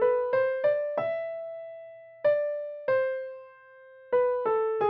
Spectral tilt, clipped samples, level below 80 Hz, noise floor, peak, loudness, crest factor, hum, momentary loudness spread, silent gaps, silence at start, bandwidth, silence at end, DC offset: -3 dB/octave; under 0.1%; -74 dBFS; -52 dBFS; -14 dBFS; -28 LUFS; 14 dB; none; 16 LU; none; 0 s; 5.2 kHz; 0 s; under 0.1%